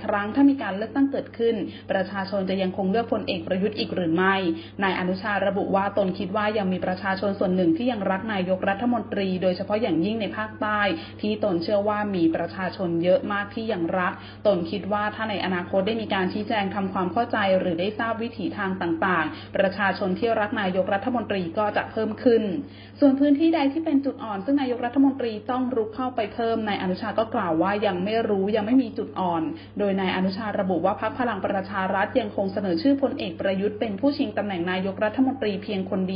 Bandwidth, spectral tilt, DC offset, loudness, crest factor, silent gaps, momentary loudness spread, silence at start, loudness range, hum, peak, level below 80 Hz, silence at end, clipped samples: 5.4 kHz; -11 dB/octave; under 0.1%; -25 LUFS; 18 dB; none; 6 LU; 0 s; 2 LU; none; -6 dBFS; -56 dBFS; 0 s; under 0.1%